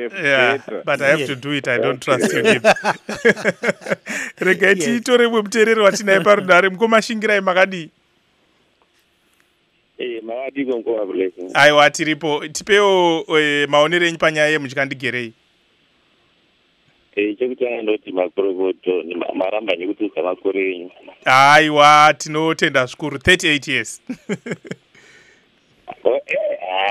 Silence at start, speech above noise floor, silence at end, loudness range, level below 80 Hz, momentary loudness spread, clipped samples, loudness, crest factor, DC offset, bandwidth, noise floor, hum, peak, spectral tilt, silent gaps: 0 s; 45 dB; 0 s; 10 LU; -52 dBFS; 13 LU; under 0.1%; -16 LUFS; 18 dB; under 0.1%; 15.5 kHz; -62 dBFS; none; 0 dBFS; -3.5 dB/octave; none